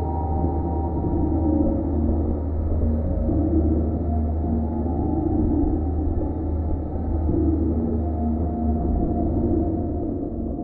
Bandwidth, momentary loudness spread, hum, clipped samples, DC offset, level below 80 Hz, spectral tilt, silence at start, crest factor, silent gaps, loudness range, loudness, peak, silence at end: 2 kHz; 5 LU; none; under 0.1%; under 0.1%; -26 dBFS; -14 dB/octave; 0 s; 14 dB; none; 1 LU; -24 LUFS; -8 dBFS; 0 s